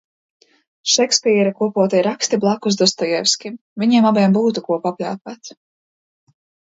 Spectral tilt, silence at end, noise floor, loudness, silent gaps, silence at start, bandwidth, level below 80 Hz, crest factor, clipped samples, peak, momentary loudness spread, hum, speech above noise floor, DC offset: -4 dB/octave; 1.15 s; under -90 dBFS; -17 LUFS; 3.61-3.76 s; 0.85 s; 8 kHz; -68 dBFS; 18 dB; under 0.1%; 0 dBFS; 13 LU; none; over 73 dB; under 0.1%